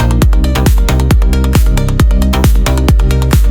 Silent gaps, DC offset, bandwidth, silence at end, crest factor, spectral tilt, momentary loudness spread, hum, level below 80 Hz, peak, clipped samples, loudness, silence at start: none; under 0.1%; 17.5 kHz; 0 s; 8 dB; -6 dB/octave; 1 LU; none; -10 dBFS; 0 dBFS; under 0.1%; -11 LUFS; 0 s